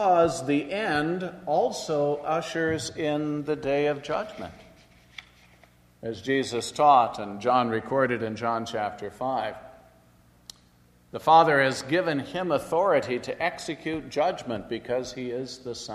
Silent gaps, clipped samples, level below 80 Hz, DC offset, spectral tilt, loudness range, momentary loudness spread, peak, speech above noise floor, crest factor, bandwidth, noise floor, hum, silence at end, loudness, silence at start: none; under 0.1%; -60 dBFS; under 0.1%; -5 dB/octave; 7 LU; 14 LU; -6 dBFS; 33 dB; 22 dB; 13.5 kHz; -59 dBFS; 60 Hz at -60 dBFS; 0 s; -26 LUFS; 0 s